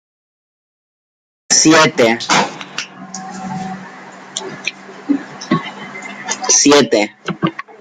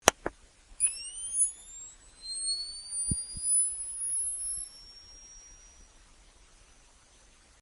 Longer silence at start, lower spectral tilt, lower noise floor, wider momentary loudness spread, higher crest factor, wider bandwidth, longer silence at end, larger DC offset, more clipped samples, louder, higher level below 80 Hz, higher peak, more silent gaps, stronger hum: first, 1.5 s vs 0.05 s; first, -2.5 dB/octave vs -0.5 dB/octave; second, -35 dBFS vs -59 dBFS; second, 20 LU vs 23 LU; second, 18 dB vs 34 dB; first, 14.5 kHz vs 11.5 kHz; second, 0.1 s vs 1.8 s; neither; neither; first, -14 LUFS vs -30 LUFS; about the same, -60 dBFS vs -56 dBFS; about the same, 0 dBFS vs 0 dBFS; neither; neither